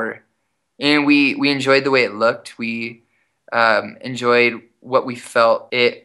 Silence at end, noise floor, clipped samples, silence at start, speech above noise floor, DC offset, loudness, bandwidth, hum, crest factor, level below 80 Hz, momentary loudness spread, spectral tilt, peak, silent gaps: 0.05 s; -72 dBFS; under 0.1%; 0 s; 54 dB; under 0.1%; -17 LUFS; 12 kHz; none; 18 dB; -72 dBFS; 13 LU; -4.5 dB/octave; 0 dBFS; none